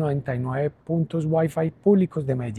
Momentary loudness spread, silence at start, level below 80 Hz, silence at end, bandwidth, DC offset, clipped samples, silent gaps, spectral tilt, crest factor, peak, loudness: 7 LU; 0 s; -56 dBFS; 0 s; 12 kHz; under 0.1%; under 0.1%; none; -9.5 dB/octave; 16 dB; -6 dBFS; -24 LUFS